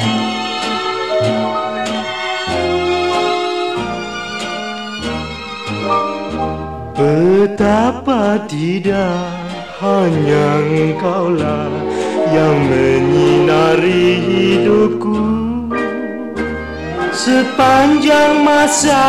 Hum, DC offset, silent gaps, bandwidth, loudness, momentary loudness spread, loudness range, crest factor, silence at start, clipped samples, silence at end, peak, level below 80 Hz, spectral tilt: none; 0.5%; none; 15 kHz; -15 LUFS; 11 LU; 6 LU; 10 dB; 0 s; under 0.1%; 0 s; -4 dBFS; -40 dBFS; -5 dB/octave